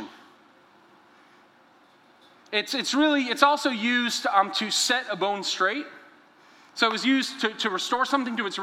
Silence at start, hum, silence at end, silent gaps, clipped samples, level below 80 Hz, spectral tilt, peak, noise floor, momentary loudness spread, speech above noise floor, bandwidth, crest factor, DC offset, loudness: 0 s; none; 0 s; none; under 0.1%; -80 dBFS; -2 dB/octave; -2 dBFS; -57 dBFS; 7 LU; 33 dB; 16.5 kHz; 24 dB; under 0.1%; -24 LUFS